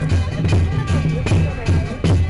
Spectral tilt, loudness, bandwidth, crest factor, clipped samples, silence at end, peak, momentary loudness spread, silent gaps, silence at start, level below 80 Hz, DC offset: -7 dB/octave; -19 LUFS; 11 kHz; 6 dB; under 0.1%; 0 s; -10 dBFS; 2 LU; none; 0 s; -26 dBFS; under 0.1%